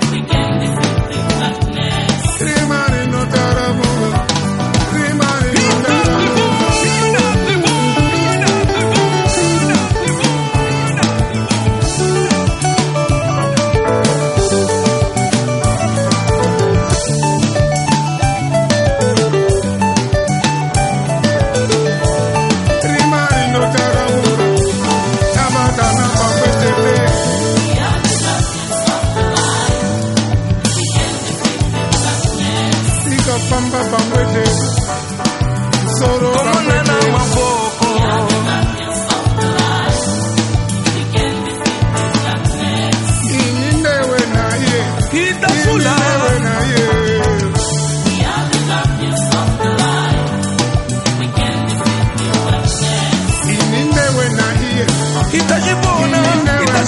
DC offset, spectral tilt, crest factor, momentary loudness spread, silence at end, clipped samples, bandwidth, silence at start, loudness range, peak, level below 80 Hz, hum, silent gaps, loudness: under 0.1%; -4.5 dB/octave; 14 dB; 4 LU; 0 s; under 0.1%; 11.5 kHz; 0 s; 2 LU; 0 dBFS; -28 dBFS; none; none; -14 LUFS